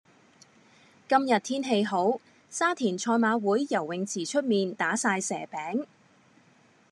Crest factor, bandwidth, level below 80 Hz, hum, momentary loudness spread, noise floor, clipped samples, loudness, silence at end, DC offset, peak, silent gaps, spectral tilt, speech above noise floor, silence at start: 20 dB; 12 kHz; -88 dBFS; none; 9 LU; -61 dBFS; under 0.1%; -27 LUFS; 1.05 s; under 0.1%; -8 dBFS; none; -4 dB/octave; 34 dB; 1.1 s